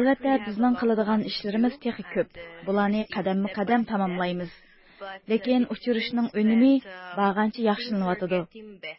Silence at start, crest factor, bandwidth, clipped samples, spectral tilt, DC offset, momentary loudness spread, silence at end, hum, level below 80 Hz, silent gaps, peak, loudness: 0 s; 16 dB; 5.8 kHz; under 0.1%; -10.5 dB/octave; under 0.1%; 12 LU; 0.05 s; none; -62 dBFS; none; -10 dBFS; -25 LUFS